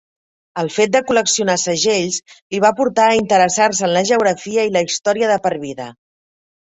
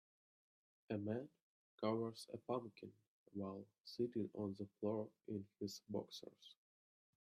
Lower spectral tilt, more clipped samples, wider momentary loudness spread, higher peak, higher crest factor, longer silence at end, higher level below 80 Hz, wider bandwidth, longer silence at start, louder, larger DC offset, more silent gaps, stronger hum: second, -3 dB/octave vs -6.5 dB/octave; neither; second, 11 LU vs 15 LU; first, -2 dBFS vs -28 dBFS; about the same, 16 dB vs 20 dB; first, 0.85 s vs 0.7 s; first, -58 dBFS vs -88 dBFS; second, 8.4 kHz vs 14 kHz; second, 0.55 s vs 0.9 s; first, -16 LUFS vs -47 LUFS; neither; second, 2.42-2.50 s vs 1.42-1.78 s, 3.08-3.26 s, 3.80-3.84 s; neither